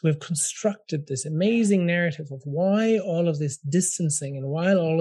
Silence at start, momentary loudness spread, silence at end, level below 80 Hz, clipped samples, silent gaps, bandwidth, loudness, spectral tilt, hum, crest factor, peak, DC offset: 0.05 s; 8 LU; 0 s; -72 dBFS; under 0.1%; none; 12.5 kHz; -24 LUFS; -5.5 dB/octave; none; 14 dB; -10 dBFS; under 0.1%